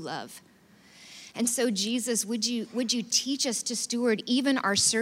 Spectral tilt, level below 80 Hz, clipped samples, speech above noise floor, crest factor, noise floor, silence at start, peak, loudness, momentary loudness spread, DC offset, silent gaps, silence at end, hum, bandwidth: -2 dB/octave; -76 dBFS; under 0.1%; 28 dB; 18 dB; -56 dBFS; 0 s; -10 dBFS; -27 LUFS; 13 LU; under 0.1%; none; 0 s; none; 16 kHz